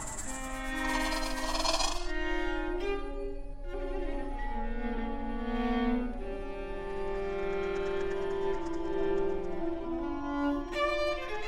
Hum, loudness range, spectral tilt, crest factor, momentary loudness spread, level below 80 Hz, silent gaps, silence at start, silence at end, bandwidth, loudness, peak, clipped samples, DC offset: none; 3 LU; -4 dB/octave; 18 dB; 8 LU; -40 dBFS; none; 0 s; 0 s; 16 kHz; -34 LUFS; -14 dBFS; under 0.1%; under 0.1%